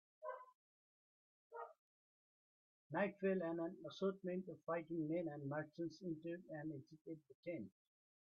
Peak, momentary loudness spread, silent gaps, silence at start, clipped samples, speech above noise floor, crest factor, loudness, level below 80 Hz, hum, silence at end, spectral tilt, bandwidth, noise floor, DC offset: -28 dBFS; 15 LU; 0.55-1.50 s, 1.79-2.90 s, 7.01-7.05 s, 7.35-7.43 s; 0.2 s; under 0.1%; over 44 dB; 20 dB; -47 LUFS; -90 dBFS; none; 0.7 s; -6.5 dB/octave; 6.6 kHz; under -90 dBFS; under 0.1%